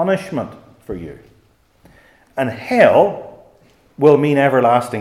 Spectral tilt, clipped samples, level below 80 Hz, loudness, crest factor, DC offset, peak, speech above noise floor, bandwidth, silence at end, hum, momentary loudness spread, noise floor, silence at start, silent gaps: -7 dB/octave; under 0.1%; -54 dBFS; -15 LUFS; 18 dB; under 0.1%; 0 dBFS; 40 dB; 14.5 kHz; 0 s; none; 20 LU; -55 dBFS; 0 s; none